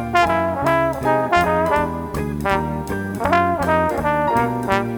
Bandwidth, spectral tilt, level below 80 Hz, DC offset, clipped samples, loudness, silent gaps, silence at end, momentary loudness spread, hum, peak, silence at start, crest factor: over 20 kHz; -6 dB/octave; -38 dBFS; under 0.1%; under 0.1%; -19 LUFS; none; 0 s; 7 LU; none; -2 dBFS; 0 s; 18 dB